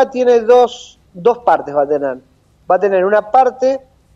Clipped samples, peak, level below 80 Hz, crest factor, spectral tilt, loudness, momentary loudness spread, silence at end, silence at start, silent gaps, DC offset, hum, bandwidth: under 0.1%; -2 dBFS; -56 dBFS; 12 dB; -5 dB/octave; -14 LUFS; 11 LU; 0.4 s; 0 s; none; under 0.1%; none; 7.6 kHz